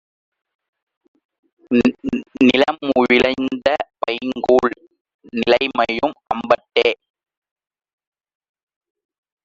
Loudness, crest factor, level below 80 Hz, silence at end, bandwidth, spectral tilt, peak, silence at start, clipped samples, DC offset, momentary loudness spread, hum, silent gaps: -18 LUFS; 18 dB; -54 dBFS; 2.5 s; 7.6 kHz; -5 dB/octave; -2 dBFS; 1.7 s; under 0.1%; under 0.1%; 11 LU; none; 5.01-5.05 s, 5.14-5.19 s